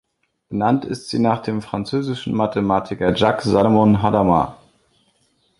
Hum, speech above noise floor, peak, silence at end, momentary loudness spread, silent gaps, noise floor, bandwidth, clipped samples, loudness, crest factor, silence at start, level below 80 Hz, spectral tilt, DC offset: none; 45 dB; -2 dBFS; 1.05 s; 10 LU; none; -63 dBFS; 11.5 kHz; under 0.1%; -19 LUFS; 18 dB; 0.5 s; -46 dBFS; -7 dB/octave; under 0.1%